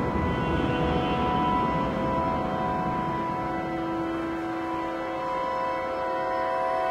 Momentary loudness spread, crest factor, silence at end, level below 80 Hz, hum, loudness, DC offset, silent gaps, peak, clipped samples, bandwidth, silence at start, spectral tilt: 5 LU; 14 dB; 0 s; -44 dBFS; none; -27 LUFS; under 0.1%; none; -12 dBFS; under 0.1%; 15 kHz; 0 s; -7.5 dB/octave